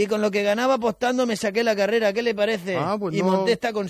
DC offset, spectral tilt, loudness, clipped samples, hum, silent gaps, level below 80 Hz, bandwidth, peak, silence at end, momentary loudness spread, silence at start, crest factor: under 0.1%; -5 dB/octave; -22 LUFS; under 0.1%; none; none; -62 dBFS; 14.5 kHz; -8 dBFS; 0 s; 3 LU; 0 s; 14 dB